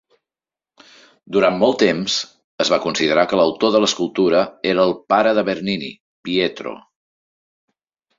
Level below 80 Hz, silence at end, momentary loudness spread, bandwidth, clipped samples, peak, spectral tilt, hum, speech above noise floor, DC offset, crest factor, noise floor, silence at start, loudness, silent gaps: -60 dBFS; 1.4 s; 9 LU; 7.8 kHz; under 0.1%; -2 dBFS; -4 dB/octave; none; over 73 dB; under 0.1%; 18 dB; under -90 dBFS; 1.3 s; -18 LUFS; 2.44-2.58 s, 6.00-6.23 s